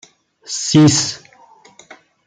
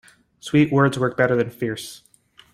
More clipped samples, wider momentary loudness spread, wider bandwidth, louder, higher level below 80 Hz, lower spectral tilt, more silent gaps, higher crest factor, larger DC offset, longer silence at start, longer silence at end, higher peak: neither; about the same, 16 LU vs 16 LU; second, 9.6 kHz vs 15 kHz; first, -14 LUFS vs -20 LUFS; about the same, -56 dBFS vs -58 dBFS; second, -4.5 dB/octave vs -6.5 dB/octave; neither; about the same, 18 dB vs 18 dB; neither; about the same, 0.5 s vs 0.45 s; first, 1.1 s vs 0.6 s; first, 0 dBFS vs -4 dBFS